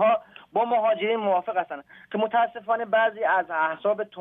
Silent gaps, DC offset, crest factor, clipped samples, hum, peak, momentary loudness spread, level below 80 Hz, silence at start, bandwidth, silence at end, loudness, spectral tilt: none; under 0.1%; 14 dB; under 0.1%; none; -10 dBFS; 7 LU; -78 dBFS; 0 s; 3.9 kHz; 0 s; -25 LUFS; -8 dB/octave